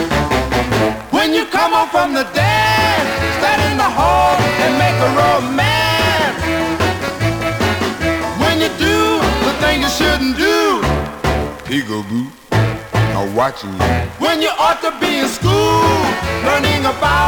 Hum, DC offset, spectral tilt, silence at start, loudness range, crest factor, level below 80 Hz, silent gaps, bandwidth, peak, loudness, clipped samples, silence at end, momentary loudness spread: none; under 0.1%; -4.5 dB/octave; 0 s; 4 LU; 14 dB; -32 dBFS; none; over 20 kHz; -2 dBFS; -15 LUFS; under 0.1%; 0 s; 6 LU